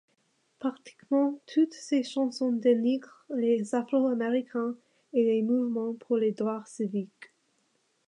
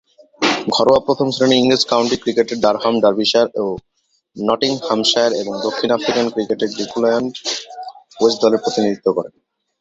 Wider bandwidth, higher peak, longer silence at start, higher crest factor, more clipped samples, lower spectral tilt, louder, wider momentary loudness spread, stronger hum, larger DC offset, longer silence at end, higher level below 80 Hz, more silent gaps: first, 10.5 kHz vs 8 kHz; second, -12 dBFS vs 0 dBFS; first, 0.6 s vs 0.4 s; about the same, 16 dB vs 18 dB; neither; first, -6 dB/octave vs -4 dB/octave; second, -29 LUFS vs -17 LUFS; about the same, 10 LU vs 9 LU; neither; neither; first, 0.85 s vs 0.55 s; second, -86 dBFS vs -56 dBFS; neither